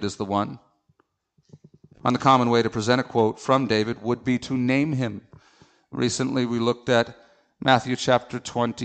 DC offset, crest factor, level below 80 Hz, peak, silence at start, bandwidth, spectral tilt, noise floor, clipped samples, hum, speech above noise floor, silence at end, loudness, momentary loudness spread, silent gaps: under 0.1%; 20 dB; -60 dBFS; -4 dBFS; 0 s; 9 kHz; -5.5 dB/octave; -67 dBFS; under 0.1%; none; 44 dB; 0 s; -23 LUFS; 9 LU; none